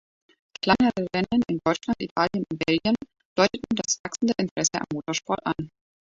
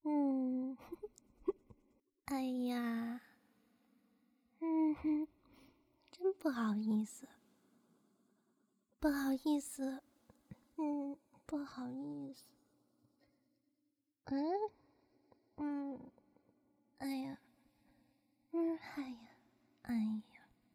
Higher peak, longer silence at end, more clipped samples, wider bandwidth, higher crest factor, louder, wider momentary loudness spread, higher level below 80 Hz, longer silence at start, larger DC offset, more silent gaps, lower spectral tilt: first, -4 dBFS vs -22 dBFS; second, 0.35 s vs 0.5 s; neither; second, 7.8 kHz vs 17.5 kHz; about the same, 22 dB vs 20 dB; first, -25 LUFS vs -40 LUFS; second, 7 LU vs 19 LU; first, -56 dBFS vs -72 dBFS; first, 0.65 s vs 0.05 s; neither; first, 2.11-2.16 s, 3.25-3.36 s, 3.99-4.04 s, 4.51-4.56 s vs none; second, -4 dB/octave vs -5.5 dB/octave